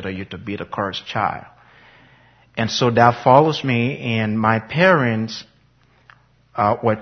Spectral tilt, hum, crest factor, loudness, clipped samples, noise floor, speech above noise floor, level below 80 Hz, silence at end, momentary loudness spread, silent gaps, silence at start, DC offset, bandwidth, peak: -6 dB/octave; none; 20 dB; -18 LUFS; under 0.1%; -56 dBFS; 38 dB; -56 dBFS; 0 s; 15 LU; none; 0 s; under 0.1%; 6.6 kHz; 0 dBFS